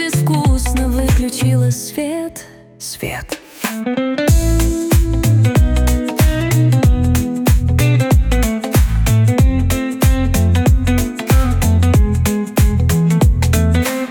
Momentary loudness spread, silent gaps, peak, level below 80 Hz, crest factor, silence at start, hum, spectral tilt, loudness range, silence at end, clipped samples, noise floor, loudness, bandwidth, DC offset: 9 LU; none; -2 dBFS; -18 dBFS; 12 dB; 0 s; none; -6 dB/octave; 5 LU; 0 s; under 0.1%; -36 dBFS; -15 LUFS; 19.5 kHz; under 0.1%